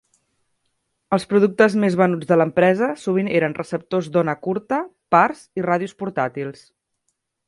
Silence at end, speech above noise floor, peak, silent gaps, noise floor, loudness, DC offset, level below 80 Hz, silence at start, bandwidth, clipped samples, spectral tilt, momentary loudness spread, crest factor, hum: 0.95 s; 55 dB; 0 dBFS; none; -74 dBFS; -20 LUFS; under 0.1%; -64 dBFS; 1.1 s; 11.5 kHz; under 0.1%; -7 dB/octave; 9 LU; 20 dB; none